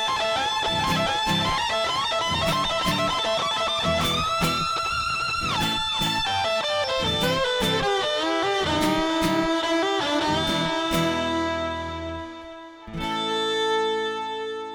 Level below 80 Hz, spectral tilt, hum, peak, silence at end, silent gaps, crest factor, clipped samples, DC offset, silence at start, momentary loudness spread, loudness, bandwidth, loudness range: -44 dBFS; -3.5 dB/octave; none; -10 dBFS; 0 s; none; 14 dB; under 0.1%; under 0.1%; 0 s; 7 LU; -23 LUFS; over 20 kHz; 4 LU